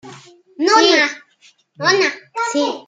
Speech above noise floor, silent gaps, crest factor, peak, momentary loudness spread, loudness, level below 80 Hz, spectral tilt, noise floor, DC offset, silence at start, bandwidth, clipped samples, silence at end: 38 dB; none; 18 dB; 0 dBFS; 10 LU; -15 LUFS; -70 dBFS; -2 dB/octave; -53 dBFS; under 0.1%; 0.05 s; 9.4 kHz; under 0.1%; 0.05 s